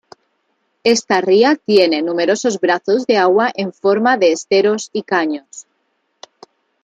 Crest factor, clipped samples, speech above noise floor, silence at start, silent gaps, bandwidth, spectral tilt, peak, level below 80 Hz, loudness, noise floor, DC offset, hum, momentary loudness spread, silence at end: 16 dB; under 0.1%; 52 dB; 0.85 s; none; 9.4 kHz; -4 dB/octave; 0 dBFS; -66 dBFS; -15 LUFS; -67 dBFS; under 0.1%; none; 7 LU; 1.25 s